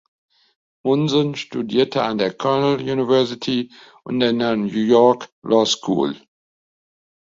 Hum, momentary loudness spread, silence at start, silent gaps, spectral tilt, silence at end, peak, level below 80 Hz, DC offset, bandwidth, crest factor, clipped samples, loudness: none; 9 LU; 0.85 s; 5.32-5.42 s; -5.5 dB/octave; 1.05 s; -2 dBFS; -60 dBFS; under 0.1%; 7.8 kHz; 18 dB; under 0.1%; -19 LUFS